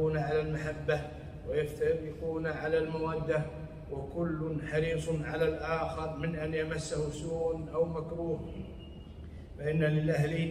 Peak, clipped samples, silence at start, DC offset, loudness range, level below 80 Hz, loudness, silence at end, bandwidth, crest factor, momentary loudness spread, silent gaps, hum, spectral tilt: -18 dBFS; under 0.1%; 0 s; under 0.1%; 2 LU; -48 dBFS; -33 LUFS; 0 s; 12.5 kHz; 16 dB; 13 LU; none; none; -7 dB/octave